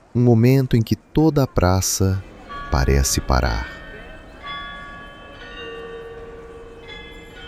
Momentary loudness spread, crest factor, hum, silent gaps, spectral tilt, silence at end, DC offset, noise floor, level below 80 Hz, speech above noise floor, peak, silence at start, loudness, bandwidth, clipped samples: 22 LU; 18 dB; none; none; -5.5 dB/octave; 0 s; under 0.1%; -38 dBFS; -30 dBFS; 21 dB; -4 dBFS; 0.15 s; -19 LUFS; 15.5 kHz; under 0.1%